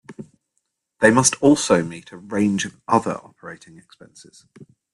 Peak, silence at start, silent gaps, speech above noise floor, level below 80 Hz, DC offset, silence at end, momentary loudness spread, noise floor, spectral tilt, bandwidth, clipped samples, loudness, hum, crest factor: 0 dBFS; 0.1 s; none; 54 dB; -58 dBFS; under 0.1%; 1.4 s; 24 LU; -74 dBFS; -4 dB/octave; 12 kHz; under 0.1%; -18 LUFS; none; 22 dB